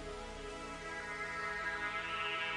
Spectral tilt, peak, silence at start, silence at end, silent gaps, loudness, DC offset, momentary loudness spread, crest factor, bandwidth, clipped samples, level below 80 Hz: -2.5 dB/octave; -26 dBFS; 0 s; 0 s; none; -40 LUFS; under 0.1%; 9 LU; 16 dB; 11.5 kHz; under 0.1%; -56 dBFS